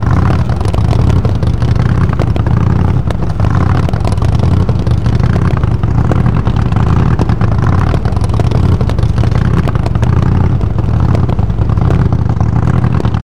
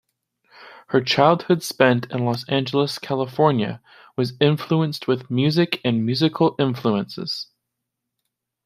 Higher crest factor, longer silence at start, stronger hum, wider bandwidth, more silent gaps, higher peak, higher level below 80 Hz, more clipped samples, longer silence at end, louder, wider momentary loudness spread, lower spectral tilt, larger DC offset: second, 10 dB vs 20 dB; second, 0 s vs 0.6 s; neither; second, 11 kHz vs 15.5 kHz; neither; about the same, 0 dBFS vs -2 dBFS; first, -18 dBFS vs -64 dBFS; neither; second, 0.05 s vs 1.2 s; first, -12 LUFS vs -21 LUFS; second, 2 LU vs 10 LU; first, -8.5 dB/octave vs -6 dB/octave; first, 10% vs under 0.1%